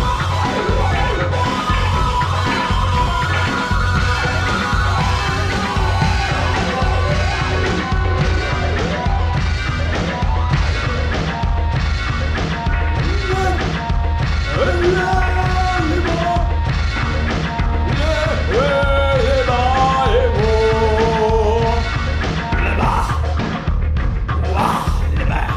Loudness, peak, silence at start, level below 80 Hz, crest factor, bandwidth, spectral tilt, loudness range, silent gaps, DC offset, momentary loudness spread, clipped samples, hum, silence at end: -18 LUFS; -4 dBFS; 0 s; -22 dBFS; 14 dB; 11.5 kHz; -6 dB/octave; 3 LU; none; under 0.1%; 4 LU; under 0.1%; none; 0 s